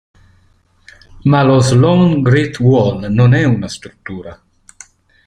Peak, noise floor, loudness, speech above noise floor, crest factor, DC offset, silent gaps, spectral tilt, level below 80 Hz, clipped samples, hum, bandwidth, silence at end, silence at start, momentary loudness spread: -2 dBFS; -53 dBFS; -12 LUFS; 41 dB; 12 dB; under 0.1%; none; -7 dB/octave; -42 dBFS; under 0.1%; none; 10 kHz; 0.95 s; 1.25 s; 18 LU